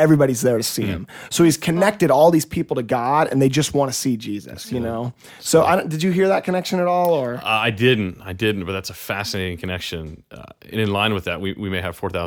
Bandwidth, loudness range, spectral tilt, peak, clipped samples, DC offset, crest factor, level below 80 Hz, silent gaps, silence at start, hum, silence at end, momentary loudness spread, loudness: 19.5 kHz; 7 LU; -5 dB/octave; -2 dBFS; under 0.1%; under 0.1%; 18 dB; -50 dBFS; none; 0 s; none; 0 s; 12 LU; -20 LUFS